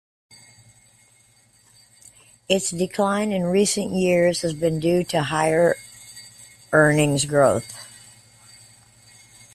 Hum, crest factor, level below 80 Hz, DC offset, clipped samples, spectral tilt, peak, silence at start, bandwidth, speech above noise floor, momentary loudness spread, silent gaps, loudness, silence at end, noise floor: none; 20 dB; -56 dBFS; under 0.1%; under 0.1%; -4.5 dB/octave; -4 dBFS; 2.5 s; 14.5 kHz; 37 dB; 21 LU; none; -20 LUFS; 1.65 s; -57 dBFS